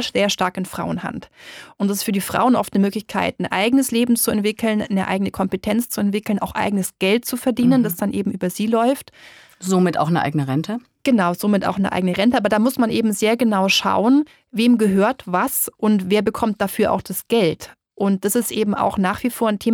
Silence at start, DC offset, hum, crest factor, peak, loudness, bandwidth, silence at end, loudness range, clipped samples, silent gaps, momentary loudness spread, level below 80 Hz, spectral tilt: 0 s; under 0.1%; none; 16 dB; -4 dBFS; -19 LUFS; over 20 kHz; 0 s; 3 LU; under 0.1%; none; 7 LU; -52 dBFS; -5 dB/octave